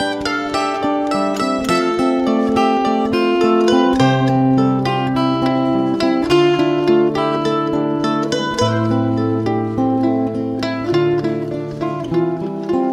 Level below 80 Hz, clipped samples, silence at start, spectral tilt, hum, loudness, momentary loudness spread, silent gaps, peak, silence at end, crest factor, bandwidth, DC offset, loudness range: -46 dBFS; under 0.1%; 0 s; -6.5 dB/octave; none; -17 LUFS; 6 LU; none; -2 dBFS; 0 s; 14 dB; 12 kHz; under 0.1%; 3 LU